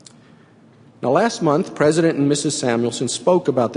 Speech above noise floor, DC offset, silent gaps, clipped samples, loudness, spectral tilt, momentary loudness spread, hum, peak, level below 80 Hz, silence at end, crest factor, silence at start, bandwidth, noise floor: 31 dB; under 0.1%; none; under 0.1%; -18 LUFS; -5 dB/octave; 4 LU; none; -2 dBFS; -62 dBFS; 0 s; 16 dB; 1 s; 11 kHz; -49 dBFS